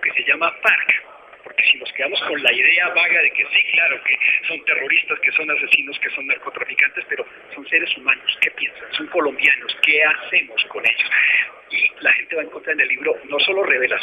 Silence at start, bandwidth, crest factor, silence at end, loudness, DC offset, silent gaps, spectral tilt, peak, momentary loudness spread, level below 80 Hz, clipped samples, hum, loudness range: 0 s; 15.5 kHz; 20 dB; 0 s; -17 LUFS; under 0.1%; none; -2.5 dB/octave; 0 dBFS; 9 LU; -70 dBFS; under 0.1%; none; 4 LU